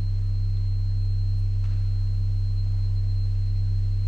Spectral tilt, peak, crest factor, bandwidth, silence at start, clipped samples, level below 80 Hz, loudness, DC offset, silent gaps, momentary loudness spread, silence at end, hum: -8 dB/octave; -16 dBFS; 6 dB; 4.4 kHz; 0 s; under 0.1%; -26 dBFS; -26 LUFS; under 0.1%; none; 1 LU; 0 s; none